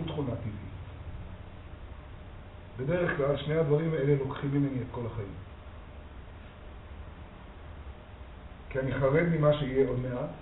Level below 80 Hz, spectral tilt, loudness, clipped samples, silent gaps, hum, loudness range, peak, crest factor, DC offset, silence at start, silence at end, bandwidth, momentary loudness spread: -48 dBFS; -7 dB/octave; -30 LUFS; under 0.1%; none; none; 14 LU; -12 dBFS; 20 dB; under 0.1%; 0 s; 0 s; 4 kHz; 22 LU